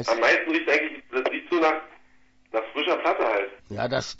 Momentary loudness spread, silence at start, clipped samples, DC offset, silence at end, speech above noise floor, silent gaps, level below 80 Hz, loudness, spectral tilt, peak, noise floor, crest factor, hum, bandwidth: 11 LU; 0 s; under 0.1%; under 0.1%; 0.05 s; 32 dB; none; -62 dBFS; -24 LUFS; -4 dB/octave; -8 dBFS; -57 dBFS; 18 dB; none; 8 kHz